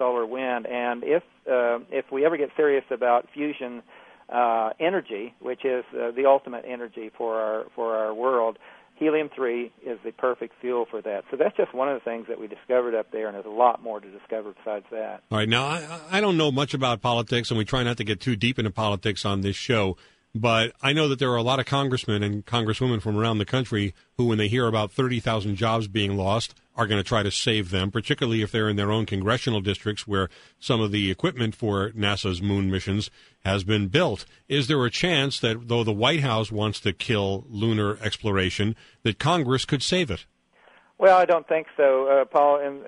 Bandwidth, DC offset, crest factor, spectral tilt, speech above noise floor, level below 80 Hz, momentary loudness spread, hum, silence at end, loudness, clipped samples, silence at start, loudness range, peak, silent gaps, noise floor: 11 kHz; under 0.1%; 20 dB; -5.5 dB/octave; 33 dB; -54 dBFS; 10 LU; none; 0 s; -24 LUFS; under 0.1%; 0 s; 4 LU; -4 dBFS; none; -57 dBFS